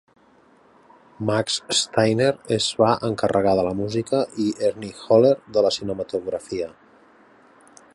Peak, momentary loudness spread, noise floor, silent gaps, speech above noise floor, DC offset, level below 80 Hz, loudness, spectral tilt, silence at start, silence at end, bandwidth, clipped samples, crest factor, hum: -4 dBFS; 10 LU; -55 dBFS; none; 34 dB; under 0.1%; -56 dBFS; -21 LUFS; -4.5 dB/octave; 1.2 s; 1.25 s; 11.5 kHz; under 0.1%; 18 dB; none